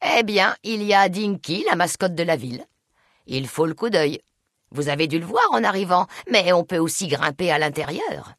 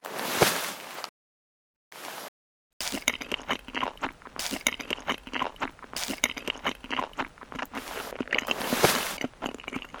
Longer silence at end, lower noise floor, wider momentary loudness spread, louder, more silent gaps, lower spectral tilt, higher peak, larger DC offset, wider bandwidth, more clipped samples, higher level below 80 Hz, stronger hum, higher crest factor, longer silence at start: about the same, 0.05 s vs 0 s; second, -65 dBFS vs under -90 dBFS; second, 10 LU vs 15 LU; first, -21 LUFS vs -30 LUFS; second, none vs 1.09-1.91 s, 2.28-2.80 s; first, -4 dB/octave vs -2 dB/octave; about the same, -4 dBFS vs -4 dBFS; neither; second, 12 kHz vs over 20 kHz; neither; second, -62 dBFS vs -56 dBFS; neither; second, 18 dB vs 28 dB; about the same, 0 s vs 0.05 s